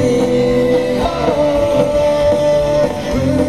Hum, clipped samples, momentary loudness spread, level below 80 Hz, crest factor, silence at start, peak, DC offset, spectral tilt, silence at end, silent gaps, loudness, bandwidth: none; under 0.1%; 3 LU; -32 dBFS; 12 dB; 0 s; -2 dBFS; 1%; -6.5 dB/octave; 0 s; none; -14 LUFS; 13.5 kHz